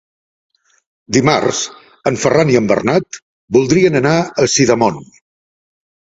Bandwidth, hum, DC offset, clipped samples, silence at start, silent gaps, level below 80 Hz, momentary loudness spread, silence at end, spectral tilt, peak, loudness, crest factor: 8 kHz; none; under 0.1%; under 0.1%; 1.1 s; 3.22-3.48 s; -50 dBFS; 10 LU; 1 s; -4.5 dB/octave; 0 dBFS; -14 LUFS; 16 dB